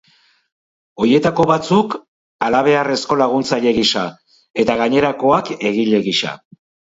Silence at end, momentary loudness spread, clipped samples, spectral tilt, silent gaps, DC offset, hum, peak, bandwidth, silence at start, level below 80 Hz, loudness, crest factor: 0.6 s; 9 LU; under 0.1%; -5 dB/octave; 2.08-2.39 s, 4.50-4.54 s; under 0.1%; none; 0 dBFS; 8 kHz; 1 s; -52 dBFS; -16 LUFS; 16 dB